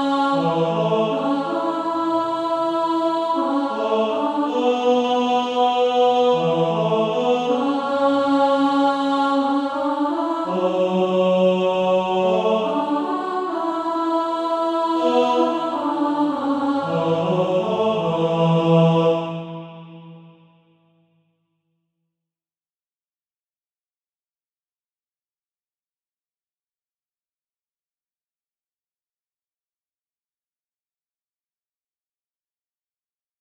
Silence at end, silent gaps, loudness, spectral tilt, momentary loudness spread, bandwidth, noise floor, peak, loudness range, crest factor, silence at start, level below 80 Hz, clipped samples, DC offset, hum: 13.1 s; none; -20 LUFS; -7 dB/octave; 5 LU; 10 kHz; under -90 dBFS; -6 dBFS; 3 LU; 16 dB; 0 s; -68 dBFS; under 0.1%; under 0.1%; none